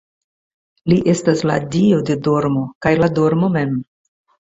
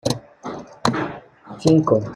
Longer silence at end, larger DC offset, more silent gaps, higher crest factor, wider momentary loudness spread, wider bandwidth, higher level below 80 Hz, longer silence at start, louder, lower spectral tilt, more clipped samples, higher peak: first, 0.75 s vs 0 s; neither; first, 2.75-2.81 s vs none; about the same, 16 dB vs 20 dB; second, 5 LU vs 19 LU; second, 8 kHz vs 13 kHz; first, -48 dBFS vs -54 dBFS; first, 0.85 s vs 0.05 s; first, -17 LUFS vs -21 LUFS; about the same, -7 dB/octave vs -6 dB/octave; neither; about the same, -2 dBFS vs -2 dBFS